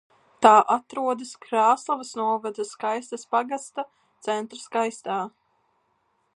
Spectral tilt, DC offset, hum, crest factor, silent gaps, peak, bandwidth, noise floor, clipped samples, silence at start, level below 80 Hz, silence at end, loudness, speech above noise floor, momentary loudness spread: -3.5 dB/octave; under 0.1%; none; 24 dB; none; 0 dBFS; 11.5 kHz; -70 dBFS; under 0.1%; 0.4 s; -78 dBFS; 1.1 s; -24 LUFS; 46 dB; 15 LU